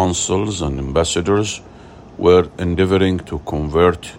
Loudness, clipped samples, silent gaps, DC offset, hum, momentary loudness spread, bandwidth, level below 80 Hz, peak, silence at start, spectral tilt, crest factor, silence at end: -17 LUFS; under 0.1%; none; under 0.1%; none; 10 LU; 11.5 kHz; -36 dBFS; 0 dBFS; 0 s; -5 dB/octave; 16 dB; 0 s